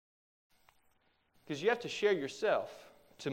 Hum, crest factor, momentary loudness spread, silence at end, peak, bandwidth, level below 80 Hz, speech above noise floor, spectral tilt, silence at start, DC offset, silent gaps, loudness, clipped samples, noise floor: none; 20 dB; 13 LU; 0 s; -18 dBFS; 16 kHz; -80 dBFS; 40 dB; -4.5 dB/octave; 1.5 s; under 0.1%; none; -34 LUFS; under 0.1%; -73 dBFS